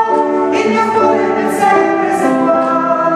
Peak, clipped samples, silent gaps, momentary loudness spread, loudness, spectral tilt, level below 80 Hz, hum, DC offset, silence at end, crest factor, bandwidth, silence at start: 0 dBFS; under 0.1%; none; 2 LU; -12 LUFS; -5.5 dB/octave; -58 dBFS; none; under 0.1%; 0 s; 12 dB; 14.5 kHz; 0 s